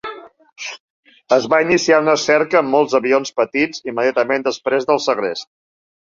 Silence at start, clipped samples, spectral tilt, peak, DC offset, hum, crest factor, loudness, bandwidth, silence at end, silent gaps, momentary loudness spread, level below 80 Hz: 0.05 s; under 0.1%; -3.5 dB/octave; -2 dBFS; under 0.1%; none; 16 dB; -16 LUFS; 7.6 kHz; 0.6 s; 0.80-1.03 s; 16 LU; -60 dBFS